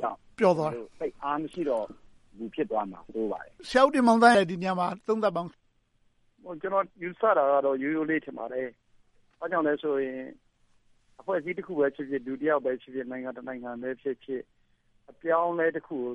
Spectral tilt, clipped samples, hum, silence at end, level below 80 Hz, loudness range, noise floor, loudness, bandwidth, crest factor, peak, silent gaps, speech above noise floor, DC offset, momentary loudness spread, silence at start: -6 dB/octave; under 0.1%; none; 0 s; -66 dBFS; 8 LU; -68 dBFS; -28 LUFS; 11.5 kHz; 24 dB; -6 dBFS; none; 40 dB; under 0.1%; 15 LU; 0 s